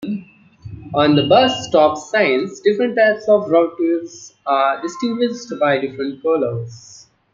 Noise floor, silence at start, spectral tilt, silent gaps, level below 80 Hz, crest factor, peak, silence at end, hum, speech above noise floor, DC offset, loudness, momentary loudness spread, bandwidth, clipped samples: -39 dBFS; 0 s; -5.5 dB/octave; none; -56 dBFS; 16 dB; -2 dBFS; 0.4 s; none; 22 dB; under 0.1%; -17 LUFS; 14 LU; 7.6 kHz; under 0.1%